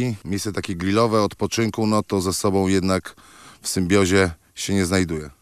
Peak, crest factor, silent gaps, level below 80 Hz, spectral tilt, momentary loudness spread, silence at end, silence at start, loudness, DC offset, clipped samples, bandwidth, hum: -4 dBFS; 16 dB; none; -52 dBFS; -5 dB/octave; 8 LU; 0.1 s; 0 s; -21 LUFS; under 0.1%; under 0.1%; 14.5 kHz; none